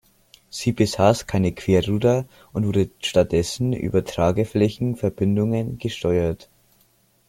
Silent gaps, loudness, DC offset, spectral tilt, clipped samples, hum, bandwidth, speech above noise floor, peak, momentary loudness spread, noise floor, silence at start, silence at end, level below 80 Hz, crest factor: none; -22 LUFS; under 0.1%; -6.5 dB/octave; under 0.1%; none; 16.5 kHz; 40 dB; -2 dBFS; 8 LU; -61 dBFS; 0.55 s; 0.85 s; -46 dBFS; 20 dB